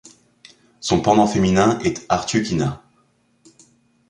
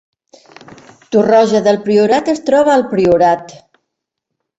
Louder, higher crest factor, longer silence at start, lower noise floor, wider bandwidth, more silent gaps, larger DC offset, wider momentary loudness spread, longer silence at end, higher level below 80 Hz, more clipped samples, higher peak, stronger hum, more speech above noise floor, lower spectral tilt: second, -19 LUFS vs -12 LUFS; first, 18 dB vs 12 dB; second, 0.8 s vs 1.1 s; second, -61 dBFS vs -76 dBFS; first, 10.5 kHz vs 8.2 kHz; neither; neither; first, 10 LU vs 4 LU; first, 1.35 s vs 1 s; first, -46 dBFS vs -52 dBFS; neither; about the same, -2 dBFS vs -2 dBFS; neither; second, 44 dB vs 65 dB; about the same, -5.5 dB/octave vs -6 dB/octave